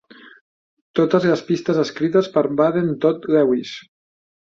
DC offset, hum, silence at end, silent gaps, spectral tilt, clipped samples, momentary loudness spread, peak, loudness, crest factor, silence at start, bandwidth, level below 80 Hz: under 0.1%; none; 0.8 s; 0.41-0.94 s; -7 dB/octave; under 0.1%; 7 LU; -2 dBFS; -19 LUFS; 18 dB; 0.25 s; 7.6 kHz; -62 dBFS